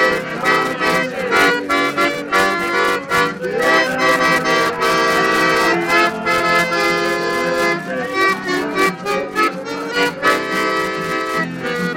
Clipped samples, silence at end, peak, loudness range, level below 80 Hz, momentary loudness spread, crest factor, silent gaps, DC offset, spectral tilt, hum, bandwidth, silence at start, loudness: under 0.1%; 0 s; -2 dBFS; 4 LU; -52 dBFS; 6 LU; 14 dB; none; under 0.1%; -3.5 dB/octave; none; 16.5 kHz; 0 s; -16 LUFS